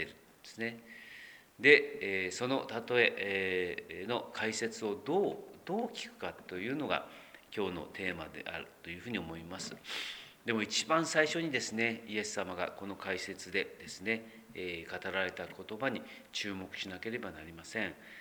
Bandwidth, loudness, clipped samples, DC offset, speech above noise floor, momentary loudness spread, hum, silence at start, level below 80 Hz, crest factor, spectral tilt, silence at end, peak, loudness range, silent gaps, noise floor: over 20 kHz; -35 LUFS; under 0.1%; under 0.1%; 20 dB; 15 LU; none; 0 s; -70 dBFS; 26 dB; -3.5 dB/octave; 0 s; -10 dBFS; 9 LU; none; -55 dBFS